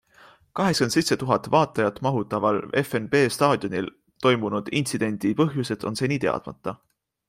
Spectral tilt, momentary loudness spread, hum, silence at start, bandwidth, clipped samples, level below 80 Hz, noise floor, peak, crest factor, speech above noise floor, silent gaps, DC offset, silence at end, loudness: -5 dB/octave; 9 LU; none; 0.55 s; 16 kHz; under 0.1%; -60 dBFS; -54 dBFS; -4 dBFS; 20 dB; 31 dB; none; under 0.1%; 0.55 s; -24 LUFS